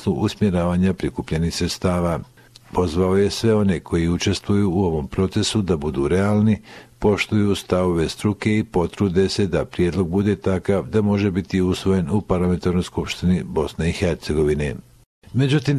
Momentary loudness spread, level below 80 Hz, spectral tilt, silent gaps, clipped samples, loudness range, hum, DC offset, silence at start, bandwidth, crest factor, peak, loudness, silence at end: 5 LU; -36 dBFS; -6.5 dB/octave; 15.06-15.22 s; under 0.1%; 1 LU; none; under 0.1%; 0 s; 13.5 kHz; 16 dB; -4 dBFS; -21 LUFS; 0 s